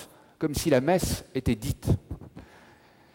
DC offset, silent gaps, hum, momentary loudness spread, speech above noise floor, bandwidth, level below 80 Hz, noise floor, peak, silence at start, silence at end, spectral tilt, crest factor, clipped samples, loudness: under 0.1%; none; none; 20 LU; 30 dB; 17 kHz; -44 dBFS; -56 dBFS; -10 dBFS; 0 s; 0.75 s; -5.5 dB/octave; 18 dB; under 0.1%; -27 LUFS